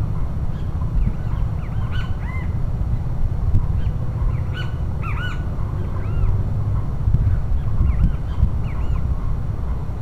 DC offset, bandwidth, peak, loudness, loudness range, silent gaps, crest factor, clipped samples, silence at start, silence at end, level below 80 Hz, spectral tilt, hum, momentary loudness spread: 2%; 6 kHz; -4 dBFS; -24 LUFS; 2 LU; none; 16 dB; under 0.1%; 0 s; 0 s; -22 dBFS; -8.5 dB/octave; none; 5 LU